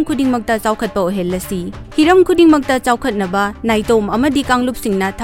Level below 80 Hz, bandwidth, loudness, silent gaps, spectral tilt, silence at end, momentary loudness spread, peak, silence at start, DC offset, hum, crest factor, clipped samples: -36 dBFS; 17 kHz; -15 LUFS; none; -5 dB/octave; 0 s; 9 LU; 0 dBFS; 0 s; under 0.1%; none; 14 dB; under 0.1%